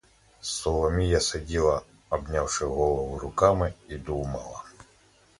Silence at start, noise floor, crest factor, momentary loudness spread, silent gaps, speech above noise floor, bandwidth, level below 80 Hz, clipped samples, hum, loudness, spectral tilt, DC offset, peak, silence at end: 0.45 s; -60 dBFS; 24 dB; 13 LU; none; 34 dB; 11.5 kHz; -38 dBFS; under 0.1%; none; -27 LUFS; -4.5 dB/octave; under 0.1%; -4 dBFS; 0.7 s